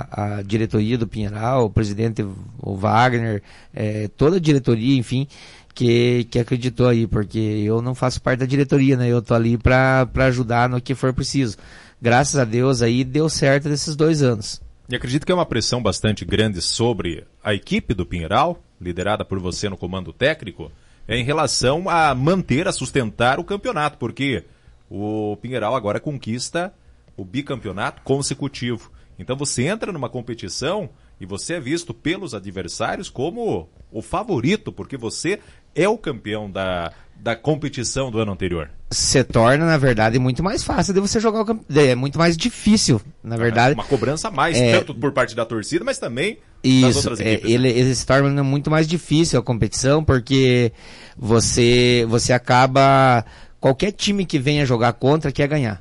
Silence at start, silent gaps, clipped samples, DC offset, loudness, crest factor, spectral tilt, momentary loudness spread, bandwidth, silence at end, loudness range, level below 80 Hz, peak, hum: 0 s; none; under 0.1%; under 0.1%; -19 LUFS; 14 dB; -5 dB/octave; 12 LU; 11.5 kHz; 0 s; 8 LU; -40 dBFS; -6 dBFS; none